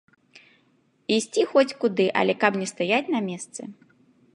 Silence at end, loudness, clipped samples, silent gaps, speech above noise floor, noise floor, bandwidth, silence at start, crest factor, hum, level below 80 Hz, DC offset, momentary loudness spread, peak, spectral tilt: 0.6 s; -23 LUFS; under 0.1%; none; 41 dB; -64 dBFS; 11.5 kHz; 0.35 s; 20 dB; none; -78 dBFS; under 0.1%; 16 LU; -4 dBFS; -4 dB/octave